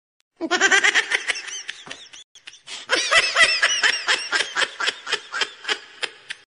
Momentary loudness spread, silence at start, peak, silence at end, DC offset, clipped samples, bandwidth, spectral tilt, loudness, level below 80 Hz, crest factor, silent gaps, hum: 19 LU; 0.4 s; -4 dBFS; 0.25 s; under 0.1%; under 0.1%; 11 kHz; 1 dB/octave; -19 LUFS; -62 dBFS; 20 dB; 2.24-2.35 s; none